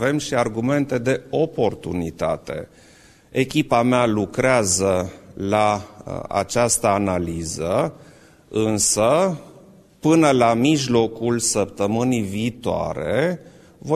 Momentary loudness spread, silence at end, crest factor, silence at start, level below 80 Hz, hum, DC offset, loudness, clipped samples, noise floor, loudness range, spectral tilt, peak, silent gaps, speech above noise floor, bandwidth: 11 LU; 0 s; 18 dB; 0 s; -48 dBFS; none; under 0.1%; -20 LUFS; under 0.1%; -48 dBFS; 4 LU; -4.5 dB/octave; -2 dBFS; none; 28 dB; 14 kHz